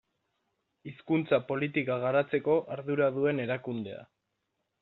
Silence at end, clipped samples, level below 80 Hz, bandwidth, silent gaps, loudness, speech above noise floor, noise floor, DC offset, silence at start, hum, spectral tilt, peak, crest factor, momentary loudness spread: 0.8 s; under 0.1%; -74 dBFS; 4.2 kHz; none; -30 LUFS; 52 dB; -82 dBFS; under 0.1%; 0.85 s; none; -5.5 dB/octave; -12 dBFS; 20 dB; 17 LU